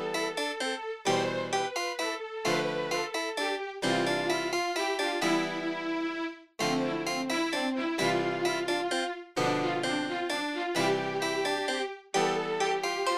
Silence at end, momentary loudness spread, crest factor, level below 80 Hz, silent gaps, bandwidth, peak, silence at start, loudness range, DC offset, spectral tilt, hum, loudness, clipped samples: 0 s; 4 LU; 16 dB; -74 dBFS; none; 15.5 kHz; -14 dBFS; 0 s; 1 LU; under 0.1%; -3.5 dB/octave; none; -30 LUFS; under 0.1%